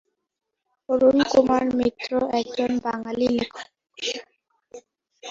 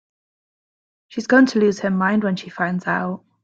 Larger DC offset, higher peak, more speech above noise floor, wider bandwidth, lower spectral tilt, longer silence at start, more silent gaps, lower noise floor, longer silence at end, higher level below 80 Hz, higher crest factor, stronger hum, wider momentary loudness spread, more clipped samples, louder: neither; about the same, -4 dBFS vs -4 dBFS; second, 60 dB vs over 71 dB; about the same, 7.6 kHz vs 7.8 kHz; second, -4.5 dB/octave vs -6.5 dB/octave; second, 0.9 s vs 1.1 s; neither; second, -82 dBFS vs under -90 dBFS; second, 0 s vs 0.25 s; first, -56 dBFS vs -64 dBFS; about the same, 20 dB vs 18 dB; neither; about the same, 15 LU vs 13 LU; neither; second, -23 LUFS vs -19 LUFS